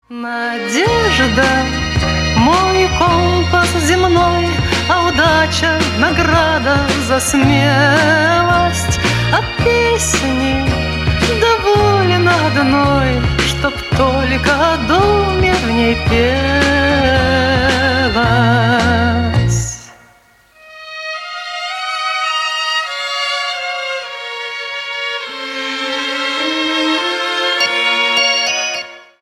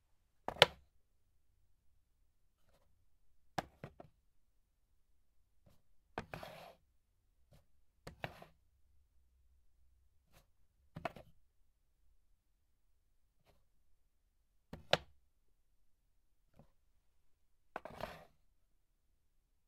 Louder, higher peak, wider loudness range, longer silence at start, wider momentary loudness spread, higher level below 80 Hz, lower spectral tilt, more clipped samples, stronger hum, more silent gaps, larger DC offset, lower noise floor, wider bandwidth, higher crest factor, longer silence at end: first, -13 LUFS vs -38 LUFS; first, 0 dBFS vs -4 dBFS; second, 7 LU vs 12 LU; second, 0.1 s vs 0.5 s; second, 9 LU vs 28 LU; first, -28 dBFS vs -72 dBFS; first, -4.5 dB/octave vs -3 dB/octave; neither; neither; neither; neither; second, -48 dBFS vs -76 dBFS; about the same, 15 kHz vs 15.5 kHz; second, 14 dB vs 44 dB; second, 0.2 s vs 1.45 s